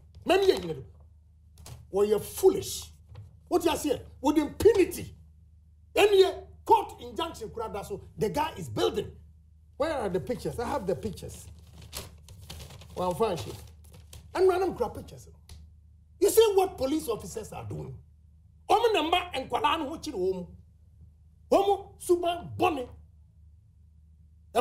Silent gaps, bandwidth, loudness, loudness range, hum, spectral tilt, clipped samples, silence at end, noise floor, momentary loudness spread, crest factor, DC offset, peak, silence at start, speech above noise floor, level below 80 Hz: none; 16 kHz; -28 LUFS; 8 LU; none; -4.5 dB/octave; under 0.1%; 0 s; -57 dBFS; 19 LU; 20 dB; under 0.1%; -8 dBFS; 0.15 s; 29 dB; -52 dBFS